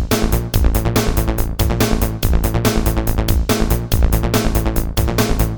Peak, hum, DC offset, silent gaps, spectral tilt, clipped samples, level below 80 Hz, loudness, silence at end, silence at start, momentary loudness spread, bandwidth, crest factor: 0 dBFS; none; under 0.1%; none; -5.5 dB/octave; under 0.1%; -18 dBFS; -18 LUFS; 0 s; 0 s; 3 LU; over 20 kHz; 16 dB